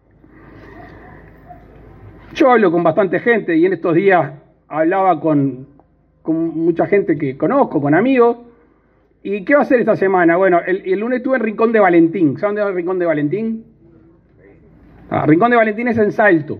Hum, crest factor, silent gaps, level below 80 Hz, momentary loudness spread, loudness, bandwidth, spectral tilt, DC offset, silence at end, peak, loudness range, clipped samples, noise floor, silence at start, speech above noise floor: none; 16 dB; none; -54 dBFS; 10 LU; -15 LUFS; 6.2 kHz; -9 dB/octave; under 0.1%; 0 s; 0 dBFS; 4 LU; under 0.1%; -55 dBFS; 0.55 s; 41 dB